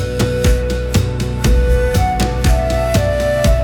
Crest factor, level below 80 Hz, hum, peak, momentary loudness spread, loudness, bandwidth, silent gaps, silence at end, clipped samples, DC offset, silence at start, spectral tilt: 12 dB; -18 dBFS; none; -2 dBFS; 3 LU; -16 LUFS; 18 kHz; none; 0 s; under 0.1%; under 0.1%; 0 s; -5.5 dB/octave